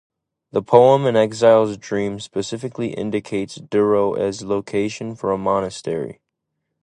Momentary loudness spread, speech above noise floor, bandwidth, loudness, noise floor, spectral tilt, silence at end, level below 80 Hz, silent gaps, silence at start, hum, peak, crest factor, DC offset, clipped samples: 12 LU; 59 dB; 10 kHz; -19 LUFS; -77 dBFS; -6 dB/octave; 0.7 s; -56 dBFS; none; 0.55 s; none; 0 dBFS; 18 dB; under 0.1%; under 0.1%